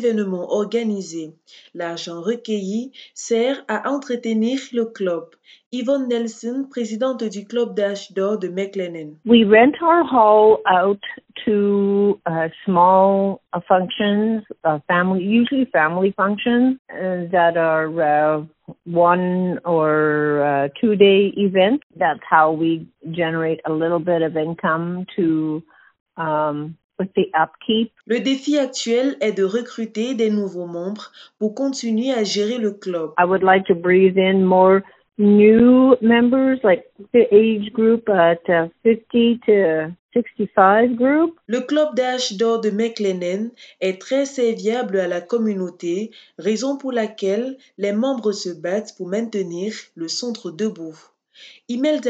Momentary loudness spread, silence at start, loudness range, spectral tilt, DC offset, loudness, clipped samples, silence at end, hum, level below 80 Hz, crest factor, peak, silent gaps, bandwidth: 13 LU; 0 s; 9 LU; -6 dB/octave; under 0.1%; -19 LUFS; under 0.1%; 0 s; none; -62 dBFS; 18 dB; 0 dBFS; 5.66-5.71 s, 16.79-16.85 s, 21.83-21.90 s, 26.00-26.06 s, 26.84-26.89 s, 39.99-40.09 s; 8 kHz